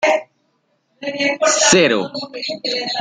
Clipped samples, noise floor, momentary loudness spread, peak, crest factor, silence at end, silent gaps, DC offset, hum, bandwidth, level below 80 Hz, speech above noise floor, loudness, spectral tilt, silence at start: under 0.1%; -65 dBFS; 15 LU; 0 dBFS; 18 dB; 0 s; none; under 0.1%; none; 10.5 kHz; -60 dBFS; 48 dB; -16 LUFS; -2 dB/octave; 0 s